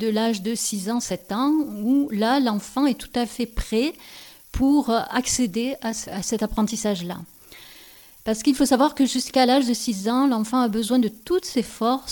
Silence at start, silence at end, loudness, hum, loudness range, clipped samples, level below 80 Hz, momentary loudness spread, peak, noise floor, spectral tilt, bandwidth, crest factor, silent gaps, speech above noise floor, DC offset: 0 s; 0 s; -22 LUFS; none; 5 LU; under 0.1%; -44 dBFS; 10 LU; -6 dBFS; -48 dBFS; -4 dB/octave; 19 kHz; 16 dB; none; 25 dB; under 0.1%